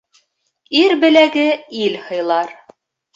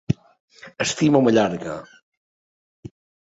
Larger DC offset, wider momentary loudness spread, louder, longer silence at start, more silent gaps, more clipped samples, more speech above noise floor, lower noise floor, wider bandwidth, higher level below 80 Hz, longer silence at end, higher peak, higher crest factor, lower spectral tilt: neither; second, 10 LU vs 15 LU; first, -15 LUFS vs -20 LUFS; first, 0.7 s vs 0.1 s; second, none vs 0.40-0.48 s; neither; second, 48 dB vs over 70 dB; second, -62 dBFS vs under -90 dBFS; about the same, 7.8 kHz vs 8.2 kHz; second, -66 dBFS vs -54 dBFS; second, 0.65 s vs 1.4 s; first, 0 dBFS vs -4 dBFS; about the same, 16 dB vs 20 dB; second, -4 dB/octave vs -5.5 dB/octave